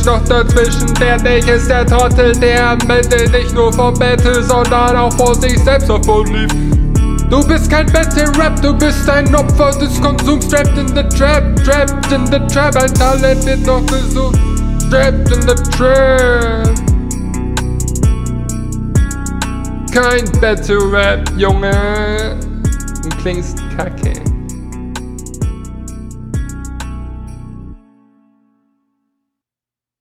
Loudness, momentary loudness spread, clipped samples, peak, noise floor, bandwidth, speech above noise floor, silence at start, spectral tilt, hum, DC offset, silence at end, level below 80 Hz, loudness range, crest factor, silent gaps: -12 LUFS; 12 LU; under 0.1%; 0 dBFS; -89 dBFS; 16 kHz; 79 dB; 0 s; -5 dB/octave; none; under 0.1%; 2.25 s; -16 dBFS; 13 LU; 12 dB; none